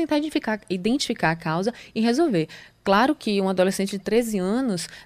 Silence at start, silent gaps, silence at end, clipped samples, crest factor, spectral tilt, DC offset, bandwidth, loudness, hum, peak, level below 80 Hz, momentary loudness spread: 0 s; none; 0 s; under 0.1%; 16 dB; -5 dB/octave; under 0.1%; 15.5 kHz; -23 LUFS; none; -8 dBFS; -54 dBFS; 7 LU